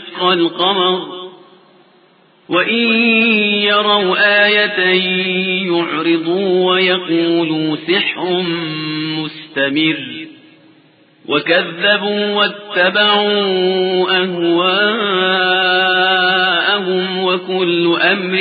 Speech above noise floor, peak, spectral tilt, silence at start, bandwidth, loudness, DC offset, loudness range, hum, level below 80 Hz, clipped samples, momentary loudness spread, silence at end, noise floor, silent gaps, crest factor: 36 dB; 0 dBFS; -10 dB/octave; 0 s; 5 kHz; -13 LUFS; under 0.1%; 5 LU; none; -74 dBFS; under 0.1%; 8 LU; 0 s; -50 dBFS; none; 14 dB